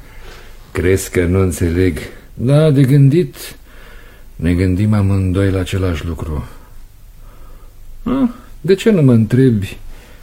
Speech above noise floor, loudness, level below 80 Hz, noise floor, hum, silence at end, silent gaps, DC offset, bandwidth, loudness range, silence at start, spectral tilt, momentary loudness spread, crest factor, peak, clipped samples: 24 dB; -14 LUFS; -32 dBFS; -37 dBFS; none; 0.1 s; none; under 0.1%; 16 kHz; 6 LU; 0.15 s; -7.5 dB/octave; 16 LU; 16 dB; 0 dBFS; under 0.1%